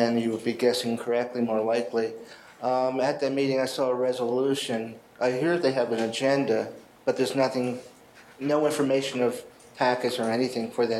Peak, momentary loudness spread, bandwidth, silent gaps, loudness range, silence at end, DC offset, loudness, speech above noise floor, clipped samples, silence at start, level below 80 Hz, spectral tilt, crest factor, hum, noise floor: -8 dBFS; 8 LU; 13.5 kHz; none; 1 LU; 0 s; under 0.1%; -26 LUFS; 25 dB; under 0.1%; 0 s; -74 dBFS; -5 dB/octave; 18 dB; none; -51 dBFS